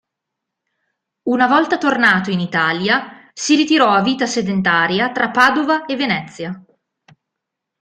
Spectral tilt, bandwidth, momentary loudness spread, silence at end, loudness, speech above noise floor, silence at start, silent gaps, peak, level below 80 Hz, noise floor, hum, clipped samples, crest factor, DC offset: -4 dB/octave; 12 kHz; 13 LU; 1.2 s; -15 LUFS; 64 dB; 1.25 s; none; 0 dBFS; -60 dBFS; -80 dBFS; none; under 0.1%; 18 dB; under 0.1%